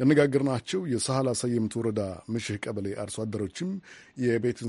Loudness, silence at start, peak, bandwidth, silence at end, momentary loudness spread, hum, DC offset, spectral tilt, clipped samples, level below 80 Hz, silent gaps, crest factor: -29 LUFS; 0 s; -8 dBFS; 11.5 kHz; 0 s; 9 LU; none; under 0.1%; -5.5 dB/octave; under 0.1%; -62 dBFS; none; 18 dB